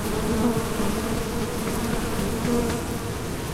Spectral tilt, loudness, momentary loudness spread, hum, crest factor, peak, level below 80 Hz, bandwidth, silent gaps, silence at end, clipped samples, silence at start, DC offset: -5 dB/octave; -26 LUFS; 6 LU; none; 14 dB; -10 dBFS; -36 dBFS; 16 kHz; none; 0 s; under 0.1%; 0 s; under 0.1%